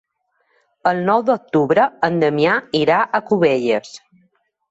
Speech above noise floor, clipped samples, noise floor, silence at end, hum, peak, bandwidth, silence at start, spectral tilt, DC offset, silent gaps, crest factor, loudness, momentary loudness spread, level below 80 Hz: 50 dB; under 0.1%; -67 dBFS; 0.75 s; none; -2 dBFS; 8 kHz; 0.85 s; -6.5 dB/octave; under 0.1%; none; 16 dB; -17 LUFS; 5 LU; -62 dBFS